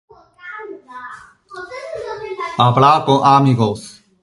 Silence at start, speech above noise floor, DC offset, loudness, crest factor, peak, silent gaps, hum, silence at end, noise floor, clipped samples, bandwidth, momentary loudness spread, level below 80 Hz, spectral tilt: 0.45 s; 25 dB; under 0.1%; -14 LUFS; 18 dB; 0 dBFS; none; none; 0.3 s; -38 dBFS; under 0.1%; 11.5 kHz; 22 LU; -54 dBFS; -6.5 dB/octave